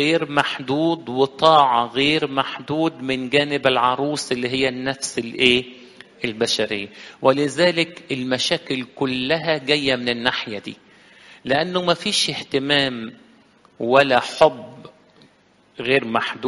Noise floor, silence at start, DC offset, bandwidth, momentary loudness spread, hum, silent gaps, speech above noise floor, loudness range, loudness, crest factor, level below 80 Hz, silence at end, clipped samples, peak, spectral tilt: -56 dBFS; 0 s; under 0.1%; 11.5 kHz; 11 LU; none; none; 36 dB; 3 LU; -20 LUFS; 20 dB; -58 dBFS; 0 s; under 0.1%; 0 dBFS; -4 dB/octave